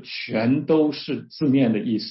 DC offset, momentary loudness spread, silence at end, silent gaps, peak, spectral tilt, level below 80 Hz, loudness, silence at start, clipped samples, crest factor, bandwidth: under 0.1%; 8 LU; 0 s; none; -8 dBFS; -10 dB/octave; -66 dBFS; -22 LUFS; 0 s; under 0.1%; 14 dB; 5.8 kHz